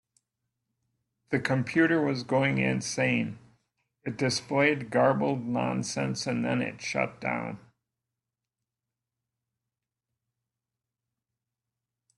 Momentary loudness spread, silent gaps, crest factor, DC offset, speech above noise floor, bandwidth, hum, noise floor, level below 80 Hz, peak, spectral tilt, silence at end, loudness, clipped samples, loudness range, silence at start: 8 LU; none; 20 dB; under 0.1%; 61 dB; 12 kHz; none; -89 dBFS; -68 dBFS; -10 dBFS; -5 dB/octave; 4.6 s; -28 LUFS; under 0.1%; 9 LU; 1.3 s